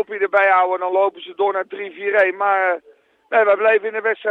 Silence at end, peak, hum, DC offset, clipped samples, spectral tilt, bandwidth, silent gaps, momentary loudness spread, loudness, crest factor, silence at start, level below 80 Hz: 0 s; -4 dBFS; none; under 0.1%; under 0.1%; -5 dB/octave; 4.8 kHz; none; 8 LU; -18 LUFS; 14 dB; 0 s; -76 dBFS